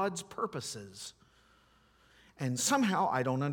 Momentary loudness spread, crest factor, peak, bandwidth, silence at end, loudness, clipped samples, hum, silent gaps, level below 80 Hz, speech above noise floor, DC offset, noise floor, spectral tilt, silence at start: 17 LU; 20 dB; -16 dBFS; 18 kHz; 0 s; -32 LUFS; under 0.1%; none; none; -72 dBFS; 33 dB; under 0.1%; -66 dBFS; -4 dB/octave; 0 s